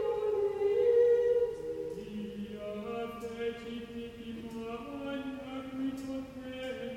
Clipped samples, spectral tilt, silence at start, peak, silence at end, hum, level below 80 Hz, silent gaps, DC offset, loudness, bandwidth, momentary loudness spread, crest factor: under 0.1%; -6.5 dB/octave; 0 s; -18 dBFS; 0 s; 50 Hz at -60 dBFS; -62 dBFS; none; under 0.1%; -34 LUFS; 13 kHz; 15 LU; 16 dB